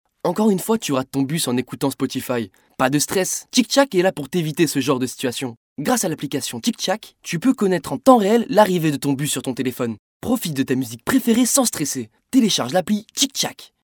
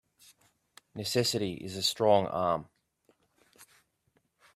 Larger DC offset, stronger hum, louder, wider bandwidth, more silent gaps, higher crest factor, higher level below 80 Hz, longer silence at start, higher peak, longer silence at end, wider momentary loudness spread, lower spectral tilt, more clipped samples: neither; neither; first, -20 LUFS vs -29 LUFS; first, over 20 kHz vs 15.5 kHz; first, 5.57-5.76 s, 9.99-10.20 s vs none; about the same, 20 dB vs 22 dB; first, -58 dBFS vs -68 dBFS; second, 0.25 s vs 0.95 s; first, 0 dBFS vs -10 dBFS; second, 0.2 s vs 0.9 s; about the same, 9 LU vs 11 LU; about the same, -4 dB/octave vs -4 dB/octave; neither